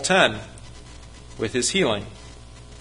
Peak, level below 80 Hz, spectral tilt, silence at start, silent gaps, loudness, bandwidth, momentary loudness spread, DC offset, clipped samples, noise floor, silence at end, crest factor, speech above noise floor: -2 dBFS; -46 dBFS; -3 dB/octave; 0 s; none; -22 LUFS; 11.5 kHz; 25 LU; under 0.1%; under 0.1%; -42 dBFS; 0 s; 22 dB; 20 dB